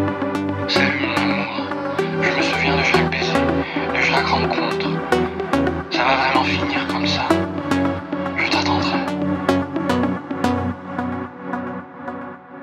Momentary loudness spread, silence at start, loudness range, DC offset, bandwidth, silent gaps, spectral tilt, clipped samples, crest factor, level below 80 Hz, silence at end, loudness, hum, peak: 10 LU; 0 s; 4 LU; under 0.1%; 14 kHz; none; -5.5 dB/octave; under 0.1%; 20 dB; -44 dBFS; 0 s; -20 LUFS; none; 0 dBFS